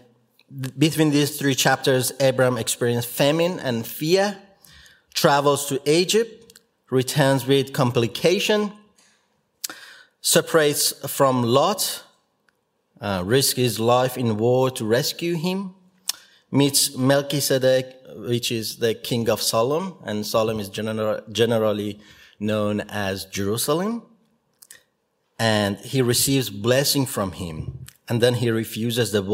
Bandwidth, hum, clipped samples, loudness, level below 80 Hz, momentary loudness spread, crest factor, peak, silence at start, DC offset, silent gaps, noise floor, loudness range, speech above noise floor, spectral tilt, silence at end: 16.5 kHz; none; under 0.1%; -21 LUFS; -58 dBFS; 12 LU; 22 dB; 0 dBFS; 0.5 s; under 0.1%; none; -71 dBFS; 4 LU; 50 dB; -4 dB/octave; 0 s